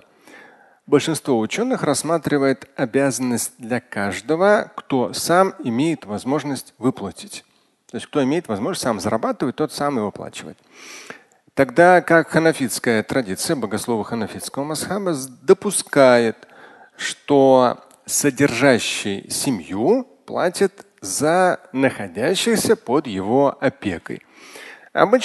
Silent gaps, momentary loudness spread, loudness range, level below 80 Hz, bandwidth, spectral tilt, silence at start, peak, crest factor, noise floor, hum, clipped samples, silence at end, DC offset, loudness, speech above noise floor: none; 16 LU; 6 LU; -56 dBFS; 12.5 kHz; -4.5 dB/octave; 0.35 s; 0 dBFS; 20 dB; -48 dBFS; none; under 0.1%; 0 s; under 0.1%; -19 LUFS; 29 dB